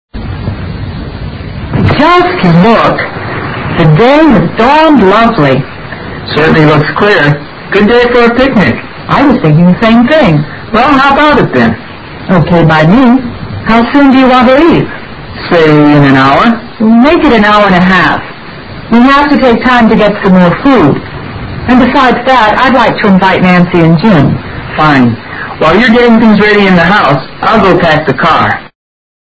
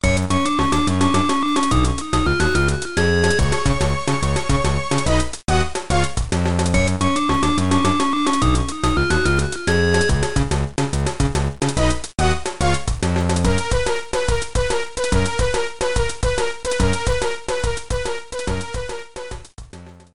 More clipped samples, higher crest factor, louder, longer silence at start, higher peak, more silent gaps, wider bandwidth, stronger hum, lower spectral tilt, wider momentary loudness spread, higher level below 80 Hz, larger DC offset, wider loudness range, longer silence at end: first, 4% vs under 0.1%; second, 6 dB vs 16 dB; first, -6 LUFS vs -20 LUFS; first, 0.15 s vs 0 s; first, 0 dBFS vs -4 dBFS; neither; second, 8 kHz vs 12 kHz; neither; first, -7.5 dB/octave vs -5 dB/octave; first, 14 LU vs 6 LU; about the same, -28 dBFS vs -26 dBFS; second, under 0.1% vs 4%; second, 1 LU vs 4 LU; first, 0.65 s vs 0 s